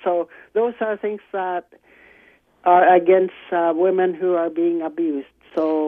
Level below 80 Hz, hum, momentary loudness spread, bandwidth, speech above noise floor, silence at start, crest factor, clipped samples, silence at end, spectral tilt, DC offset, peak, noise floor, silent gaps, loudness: -70 dBFS; none; 13 LU; 3.8 kHz; 35 dB; 0.05 s; 18 dB; under 0.1%; 0 s; -8.5 dB/octave; under 0.1%; -2 dBFS; -54 dBFS; none; -20 LUFS